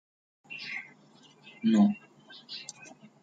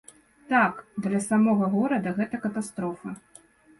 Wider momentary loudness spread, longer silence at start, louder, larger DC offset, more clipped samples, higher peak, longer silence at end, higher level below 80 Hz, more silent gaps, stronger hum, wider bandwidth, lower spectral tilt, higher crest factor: first, 26 LU vs 11 LU; about the same, 0.5 s vs 0.5 s; second, -30 LUFS vs -26 LUFS; neither; neither; second, -14 dBFS vs -8 dBFS; second, 0.35 s vs 0.65 s; second, -78 dBFS vs -66 dBFS; neither; neither; second, 9 kHz vs 11.5 kHz; about the same, -6 dB/octave vs -6.5 dB/octave; about the same, 20 dB vs 18 dB